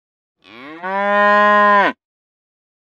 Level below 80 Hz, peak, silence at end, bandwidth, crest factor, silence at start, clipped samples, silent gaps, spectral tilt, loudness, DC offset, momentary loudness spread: -76 dBFS; 0 dBFS; 0.9 s; 7.4 kHz; 16 dB; 0.6 s; under 0.1%; none; -5.5 dB/octave; -13 LUFS; under 0.1%; 12 LU